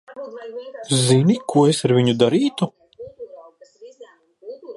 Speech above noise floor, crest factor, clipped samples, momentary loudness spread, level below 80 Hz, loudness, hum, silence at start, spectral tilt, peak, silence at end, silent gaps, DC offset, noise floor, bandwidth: 29 dB; 18 dB; under 0.1%; 23 LU; -62 dBFS; -18 LUFS; none; 0.1 s; -5.5 dB/octave; -2 dBFS; 0.05 s; none; under 0.1%; -47 dBFS; 11.5 kHz